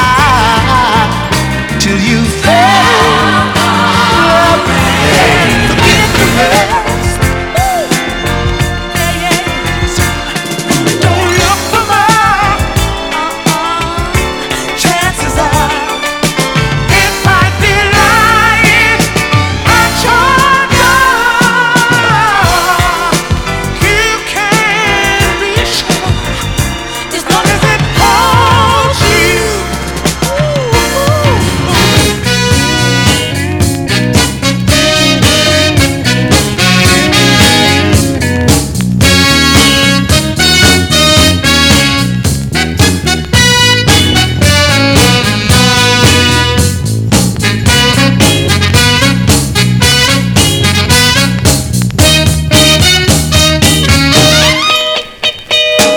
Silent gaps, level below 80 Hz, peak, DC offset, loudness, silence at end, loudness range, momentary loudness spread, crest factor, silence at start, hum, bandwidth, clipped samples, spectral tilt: none; -22 dBFS; 0 dBFS; under 0.1%; -8 LUFS; 0 s; 4 LU; 7 LU; 8 dB; 0 s; none; over 20 kHz; 1%; -3.5 dB/octave